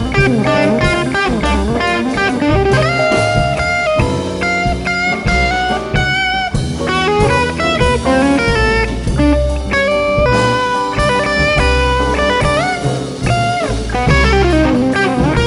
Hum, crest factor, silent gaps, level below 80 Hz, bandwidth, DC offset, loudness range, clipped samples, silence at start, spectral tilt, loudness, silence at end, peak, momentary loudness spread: none; 12 dB; none; -22 dBFS; 11.5 kHz; under 0.1%; 1 LU; under 0.1%; 0 s; -5.5 dB/octave; -13 LUFS; 0 s; 0 dBFS; 4 LU